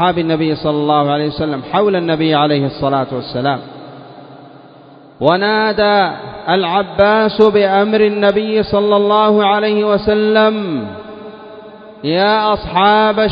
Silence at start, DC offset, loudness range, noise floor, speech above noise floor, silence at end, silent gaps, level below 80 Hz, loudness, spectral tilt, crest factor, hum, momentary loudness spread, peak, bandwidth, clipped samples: 0 s; under 0.1%; 5 LU; -40 dBFS; 27 dB; 0 s; none; -44 dBFS; -13 LUFS; -8.5 dB/octave; 14 dB; none; 13 LU; 0 dBFS; 5.2 kHz; under 0.1%